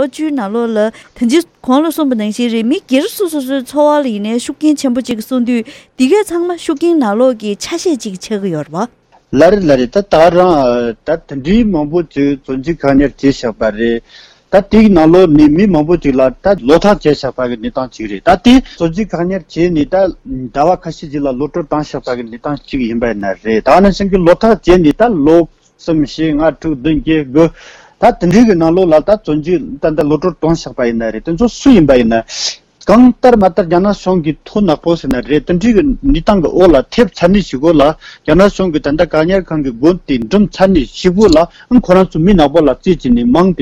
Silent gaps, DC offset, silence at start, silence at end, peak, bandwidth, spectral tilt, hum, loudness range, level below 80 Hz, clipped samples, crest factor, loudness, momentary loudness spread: none; under 0.1%; 0 s; 0 s; 0 dBFS; 14.5 kHz; -6.5 dB/octave; none; 4 LU; -30 dBFS; 0.6%; 10 dB; -11 LUFS; 10 LU